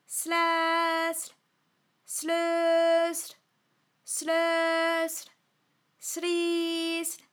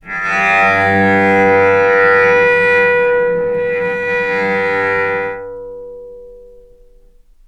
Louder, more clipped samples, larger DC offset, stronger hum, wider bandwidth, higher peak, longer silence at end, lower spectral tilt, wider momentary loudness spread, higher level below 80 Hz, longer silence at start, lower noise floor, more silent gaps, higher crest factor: second, -27 LUFS vs -12 LUFS; neither; neither; neither; first, over 20 kHz vs 8.6 kHz; second, -14 dBFS vs 0 dBFS; second, 0.15 s vs 1.05 s; second, 0.5 dB/octave vs -6 dB/octave; second, 11 LU vs 17 LU; second, under -90 dBFS vs -46 dBFS; about the same, 0.1 s vs 0.05 s; first, -73 dBFS vs -45 dBFS; neither; about the same, 16 dB vs 14 dB